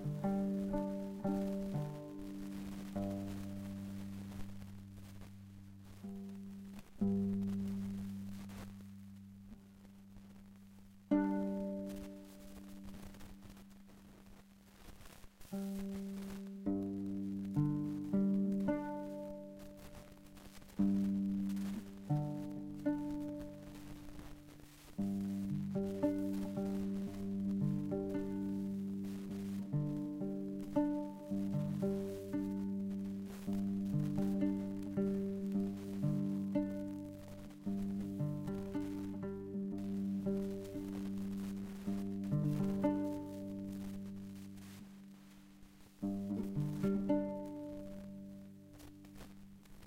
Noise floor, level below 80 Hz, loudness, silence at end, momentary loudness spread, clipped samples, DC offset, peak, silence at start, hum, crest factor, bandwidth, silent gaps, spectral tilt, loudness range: -60 dBFS; -60 dBFS; -40 LUFS; 0 s; 20 LU; under 0.1%; under 0.1%; -20 dBFS; 0 s; none; 20 dB; 16 kHz; none; -8.5 dB/octave; 8 LU